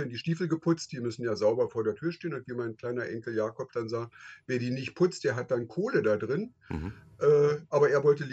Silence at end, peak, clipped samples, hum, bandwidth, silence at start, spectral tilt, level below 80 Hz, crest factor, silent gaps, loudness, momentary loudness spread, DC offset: 0 s; -12 dBFS; under 0.1%; none; 8.2 kHz; 0 s; -6.5 dB/octave; -58 dBFS; 16 dB; none; -30 LUFS; 12 LU; under 0.1%